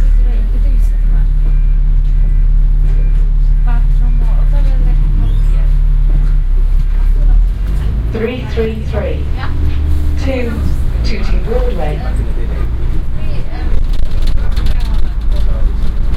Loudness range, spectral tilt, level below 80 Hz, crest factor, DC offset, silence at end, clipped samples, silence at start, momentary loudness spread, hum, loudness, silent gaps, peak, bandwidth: 4 LU; -8 dB/octave; -10 dBFS; 10 dB; under 0.1%; 0 s; under 0.1%; 0 s; 4 LU; none; -17 LUFS; none; 0 dBFS; 5.2 kHz